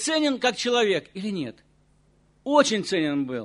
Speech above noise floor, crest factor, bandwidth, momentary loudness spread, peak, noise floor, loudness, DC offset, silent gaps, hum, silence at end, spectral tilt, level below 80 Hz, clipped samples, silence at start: 38 dB; 20 dB; 11 kHz; 12 LU; -4 dBFS; -61 dBFS; -24 LUFS; under 0.1%; none; none; 0 s; -3.5 dB/octave; -66 dBFS; under 0.1%; 0 s